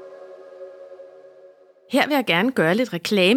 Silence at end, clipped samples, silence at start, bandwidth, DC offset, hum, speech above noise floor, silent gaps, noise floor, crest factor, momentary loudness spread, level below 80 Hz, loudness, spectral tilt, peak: 0 s; under 0.1%; 0 s; 17 kHz; under 0.1%; 50 Hz at -55 dBFS; 31 dB; none; -50 dBFS; 20 dB; 23 LU; -72 dBFS; -20 LUFS; -5 dB/octave; -2 dBFS